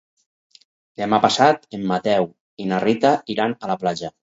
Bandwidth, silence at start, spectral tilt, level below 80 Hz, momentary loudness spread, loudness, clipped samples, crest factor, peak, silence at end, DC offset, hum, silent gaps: 8 kHz; 1 s; -5 dB/octave; -64 dBFS; 9 LU; -20 LUFS; under 0.1%; 20 dB; 0 dBFS; 0.15 s; under 0.1%; none; 2.40-2.57 s